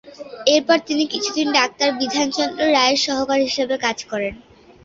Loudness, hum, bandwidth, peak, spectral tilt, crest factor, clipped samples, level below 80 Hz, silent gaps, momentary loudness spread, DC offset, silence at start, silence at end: -19 LUFS; none; 7.8 kHz; -2 dBFS; -2 dB/octave; 18 dB; under 0.1%; -56 dBFS; none; 9 LU; under 0.1%; 0.05 s; 0.45 s